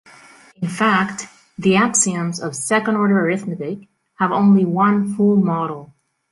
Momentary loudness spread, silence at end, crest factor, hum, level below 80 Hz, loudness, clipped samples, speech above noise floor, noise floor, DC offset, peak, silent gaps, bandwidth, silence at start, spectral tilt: 14 LU; 0.45 s; 16 dB; none; -60 dBFS; -18 LUFS; under 0.1%; 29 dB; -46 dBFS; under 0.1%; -4 dBFS; none; 11.5 kHz; 0.6 s; -5 dB/octave